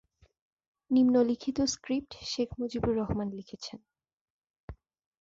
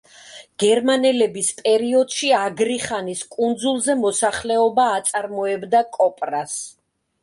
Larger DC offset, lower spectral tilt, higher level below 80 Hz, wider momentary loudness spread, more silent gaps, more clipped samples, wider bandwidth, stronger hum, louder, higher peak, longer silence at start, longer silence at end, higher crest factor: neither; first, -5 dB/octave vs -2.5 dB/octave; first, -54 dBFS vs -60 dBFS; first, 23 LU vs 9 LU; first, 4.13-4.42 s, 4.50-4.68 s vs none; neither; second, 7.8 kHz vs 11.5 kHz; neither; second, -30 LUFS vs -20 LUFS; second, -14 dBFS vs -6 dBFS; first, 0.9 s vs 0.25 s; about the same, 0.45 s vs 0.55 s; about the same, 18 dB vs 14 dB